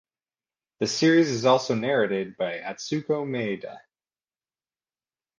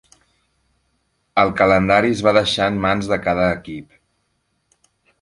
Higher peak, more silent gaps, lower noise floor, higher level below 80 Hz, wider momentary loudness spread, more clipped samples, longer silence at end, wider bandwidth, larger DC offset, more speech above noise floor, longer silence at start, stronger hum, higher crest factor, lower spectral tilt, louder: second, -6 dBFS vs 0 dBFS; neither; first, under -90 dBFS vs -69 dBFS; second, -72 dBFS vs -44 dBFS; about the same, 11 LU vs 10 LU; neither; first, 1.6 s vs 1.4 s; second, 9.6 kHz vs 11.5 kHz; neither; first, over 66 dB vs 52 dB; second, 0.8 s vs 1.35 s; neither; about the same, 20 dB vs 20 dB; about the same, -5 dB/octave vs -5.5 dB/octave; second, -24 LUFS vs -17 LUFS